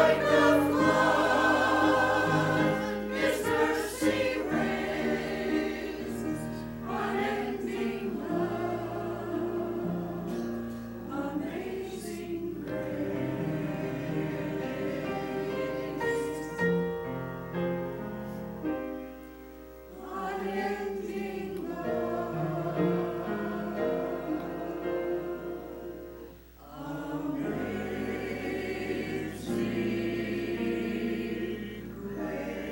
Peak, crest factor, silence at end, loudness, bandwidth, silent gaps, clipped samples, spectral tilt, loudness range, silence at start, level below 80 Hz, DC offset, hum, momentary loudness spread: -10 dBFS; 20 dB; 0 s; -31 LUFS; 16.5 kHz; none; under 0.1%; -6 dB/octave; 9 LU; 0 s; -54 dBFS; under 0.1%; none; 14 LU